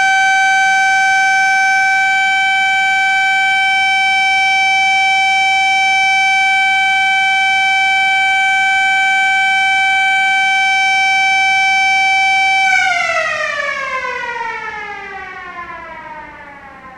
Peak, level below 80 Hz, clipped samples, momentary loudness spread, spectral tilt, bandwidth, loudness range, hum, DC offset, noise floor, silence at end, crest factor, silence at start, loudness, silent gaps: -2 dBFS; -52 dBFS; under 0.1%; 12 LU; 1 dB/octave; 13 kHz; 5 LU; none; under 0.1%; -35 dBFS; 0 s; 12 dB; 0 s; -11 LUFS; none